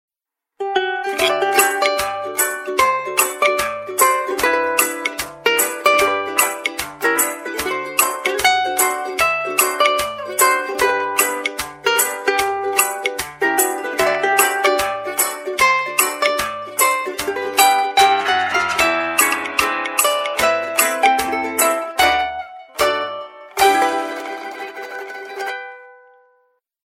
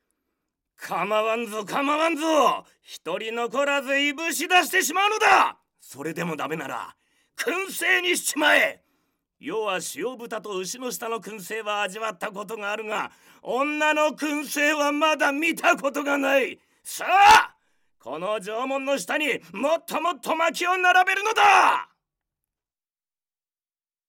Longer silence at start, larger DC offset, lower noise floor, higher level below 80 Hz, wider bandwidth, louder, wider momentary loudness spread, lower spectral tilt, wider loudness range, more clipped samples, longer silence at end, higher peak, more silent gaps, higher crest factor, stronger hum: second, 0.6 s vs 0.8 s; neither; second, -83 dBFS vs under -90 dBFS; first, -52 dBFS vs -64 dBFS; about the same, 16.5 kHz vs 17 kHz; first, -17 LUFS vs -23 LUFS; second, 9 LU vs 14 LU; second, -0.5 dB/octave vs -2 dB/octave; second, 2 LU vs 8 LU; neither; second, 0.9 s vs 2.25 s; first, 0 dBFS vs -4 dBFS; neither; about the same, 18 dB vs 20 dB; neither